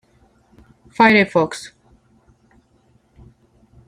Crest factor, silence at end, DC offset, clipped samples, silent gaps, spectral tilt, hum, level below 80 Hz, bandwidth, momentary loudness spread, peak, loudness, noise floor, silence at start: 20 dB; 2.2 s; under 0.1%; under 0.1%; none; -5.5 dB/octave; none; -56 dBFS; 11 kHz; 27 LU; -2 dBFS; -15 LUFS; -58 dBFS; 1 s